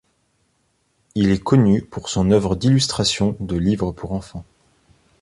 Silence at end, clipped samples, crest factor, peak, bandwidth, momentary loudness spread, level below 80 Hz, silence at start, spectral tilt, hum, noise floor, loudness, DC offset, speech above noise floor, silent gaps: 0.8 s; under 0.1%; 18 dB; -2 dBFS; 11.5 kHz; 13 LU; -40 dBFS; 1.15 s; -6 dB/octave; none; -66 dBFS; -19 LUFS; under 0.1%; 48 dB; none